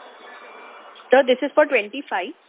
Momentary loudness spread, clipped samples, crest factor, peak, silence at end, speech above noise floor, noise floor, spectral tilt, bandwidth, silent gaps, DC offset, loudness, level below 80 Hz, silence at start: 24 LU; under 0.1%; 20 dB; -2 dBFS; 0.15 s; 23 dB; -43 dBFS; -6.5 dB/octave; 4 kHz; none; under 0.1%; -19 LUFS; -82 dBFS; 0.25 s